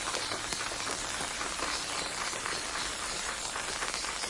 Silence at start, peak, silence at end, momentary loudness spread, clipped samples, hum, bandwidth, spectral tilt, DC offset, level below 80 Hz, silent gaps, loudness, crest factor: 0 s; -12 dBFS; 0 s; 1 LU; under 0.1%; none; 11.5 kHz; -0.5 dB/octave; under 0.1%; -54 dBFS; none; -33 LUFS; 22 dB